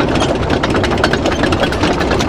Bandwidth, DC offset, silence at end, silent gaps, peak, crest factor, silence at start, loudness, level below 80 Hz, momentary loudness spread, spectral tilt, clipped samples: 17 kHz; under 0.1%; 0 s; none; 0 dBFS; 14 dB; 0 s; -14 LUFS; -26 dBFS; 1 LU; -5 dB/octave; under 0.1%